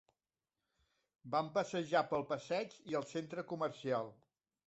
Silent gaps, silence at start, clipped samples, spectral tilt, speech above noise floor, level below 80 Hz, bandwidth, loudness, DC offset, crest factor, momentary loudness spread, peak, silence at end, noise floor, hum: none; 1.25 s; under 0.1%; -4 dB/octave; over 52 dB; -80 dBFS; 8 kHz; -39 LUFS; under 0.1%; 22 dB; 8 LU; -20 dBFS; 0.55 s; under -90 dBFS; none